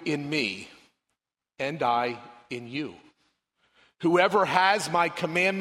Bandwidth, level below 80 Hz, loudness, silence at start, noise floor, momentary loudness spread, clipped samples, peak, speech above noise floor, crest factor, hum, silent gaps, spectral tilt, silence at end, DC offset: 16 kHz; -72 dBFS; -25 LUFS; 0 s; -83 dBFS; 17 LU; under 0.1%; -4 dBFS; 58 dB; 24 dB; none; none; -4.5 dB/octave; 0 s; under 0.1%